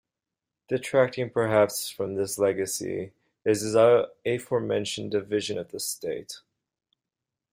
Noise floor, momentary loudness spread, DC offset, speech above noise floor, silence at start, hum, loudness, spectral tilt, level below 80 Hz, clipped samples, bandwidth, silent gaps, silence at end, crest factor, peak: -88 dBFS; 13 LU; under 0.1%; 62 dB; 0.7 s; none; -26 LUFS; -4.5 dB/octave; -68 dBFS; under 0.1%; 16 kHz; none; 1.15 s; 20 dB; -6 dBFS